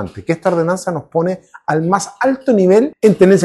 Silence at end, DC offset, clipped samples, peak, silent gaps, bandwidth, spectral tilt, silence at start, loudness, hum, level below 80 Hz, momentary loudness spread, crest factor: 0 s; under 0.1%; under 0.1%; 0 dBFS; none; 12.5 kHz; -6.5 dB/octave; 0 s; -15 LUFS; none; -54 dBFS; 9 LU; 14 dB